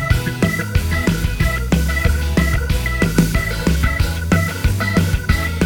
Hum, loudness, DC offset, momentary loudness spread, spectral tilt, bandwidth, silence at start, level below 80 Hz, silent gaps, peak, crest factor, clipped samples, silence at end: none; -18 LUFS; 0.1%; 2 LU; -5.5 dB/octave; over 20 kHz; 0 s; -22 dBFS; none; -2 dBFS; 16 dB; under 0.1%; 0 s